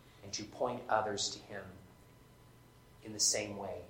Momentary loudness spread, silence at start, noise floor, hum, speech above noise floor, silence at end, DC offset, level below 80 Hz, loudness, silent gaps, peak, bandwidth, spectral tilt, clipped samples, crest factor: 18 LU; 0 s; -61 dBFS; none; 23 dB; 0 s; under 0.1%; -68 dBFS; -35 LUFS; none; -14 dBFS; 16.5 kHz; -1.5 dB/octave; under 0.1%; 24 dB